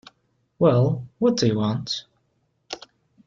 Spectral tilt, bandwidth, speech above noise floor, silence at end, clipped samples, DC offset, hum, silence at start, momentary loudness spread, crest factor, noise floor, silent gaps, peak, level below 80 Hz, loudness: -6.5 dB/octave; 7.6 kHz; 49 dB; 0.5 s; under 0.1%; under 0.1%; none; 0.6 s; 19 LU; 18 dB; -70 dBFS; none; -6 dBFS; -58 dBFS; -22 LUFS